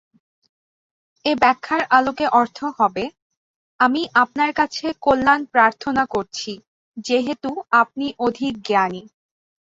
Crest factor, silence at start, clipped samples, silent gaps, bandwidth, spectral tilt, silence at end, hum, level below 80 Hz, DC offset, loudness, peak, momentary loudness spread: 20 dB; 1.25 s; under 0.1%; 3.22-3.30 s, 3.37-3.79 s, 6.67-6.92 s; 7.8 kHz; -4 dB/octave; 0.65 s; none; -56 dBFS; under 0.1%; -19 LUFS; -2 dBFS; 12 LU